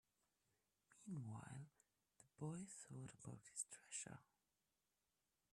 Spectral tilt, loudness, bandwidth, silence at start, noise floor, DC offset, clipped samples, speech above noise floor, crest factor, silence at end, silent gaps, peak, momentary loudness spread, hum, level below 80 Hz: -4.5 dB/octave; -54 LUFS; 13 kHz; 0.9 s; under -90 dBFS; under 0.1%; under 0.1%; over 36 dB; 24 dB; 1.3 s; none; -34 dBFS; 8 LU; none; -86 dBFS